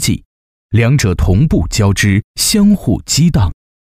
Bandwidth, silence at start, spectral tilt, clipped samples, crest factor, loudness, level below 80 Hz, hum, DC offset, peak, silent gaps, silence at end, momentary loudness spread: 16 kHz; 0 s; -5 dB/octave; under 0.1%; 10 dB; -13 LUFS; -24 dBFS; none; under 0.1%; -2 dBFS; 0.25-0.69 s, 2.24-2.34 s; 0.3 s; 6 LU